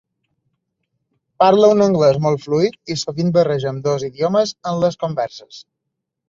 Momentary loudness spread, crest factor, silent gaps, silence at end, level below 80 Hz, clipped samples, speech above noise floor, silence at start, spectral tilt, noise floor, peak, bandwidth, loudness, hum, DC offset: 11 LU; 16 dB; none; 0.7 s; -58 dBFS; under 0.1%; 62 dB; 1.4 s; -6 dB/octave; -78 dBFS; -2 dBFS; 7.8 kHz; -17 LUFS; none; under 0.1%